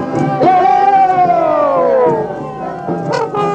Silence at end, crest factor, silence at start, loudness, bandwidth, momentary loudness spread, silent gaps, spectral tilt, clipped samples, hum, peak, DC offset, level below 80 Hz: 0 s; 12 dB; 0 s; -12 LUFS; 8.6 kHz; 12 LU; none; -7 dB/octave; under 0.1%; none; 0 dBFS; under 0.1%; -50 dBFS